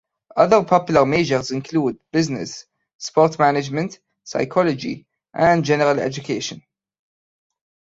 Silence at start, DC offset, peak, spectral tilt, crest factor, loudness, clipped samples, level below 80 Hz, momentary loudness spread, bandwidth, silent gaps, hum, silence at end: 0.35 s; under 0.1%; -2 dBFS; -5.5 dB/octave; 18 dB; -19 LUFS; under 0.1%; -56 dBFS; 14 LU; 8 kHz; 2.95-2.99 s; none; 1.3 s